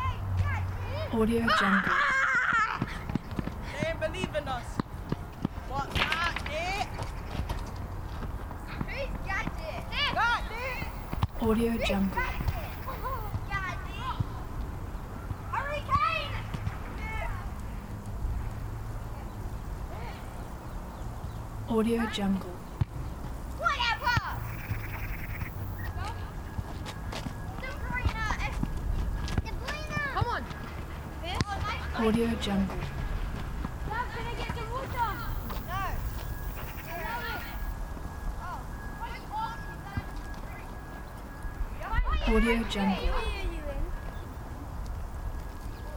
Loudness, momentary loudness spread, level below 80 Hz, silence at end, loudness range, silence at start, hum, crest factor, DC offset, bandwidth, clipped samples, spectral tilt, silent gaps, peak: -33 LUFS; 13 LU; -38 dBFS; 0 s; 8 LU; 0 s; none; 22 dB; under 0.1%; over 20 kHz; under 0.1%; -5.5 dB/octave; none; -10 dBFS